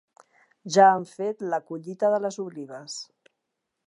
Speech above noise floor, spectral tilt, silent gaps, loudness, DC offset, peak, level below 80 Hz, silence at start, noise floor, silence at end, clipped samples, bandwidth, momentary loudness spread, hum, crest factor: 57 dB; -4.5 dB/octave; none; -24 LUFS; under 0.1%; -4 dBFS; -84 dBFS; 0.65 s; -82 dBFS; 0.85 s; under 0.1%; 11 kHz; 20 LU; none; 22 dB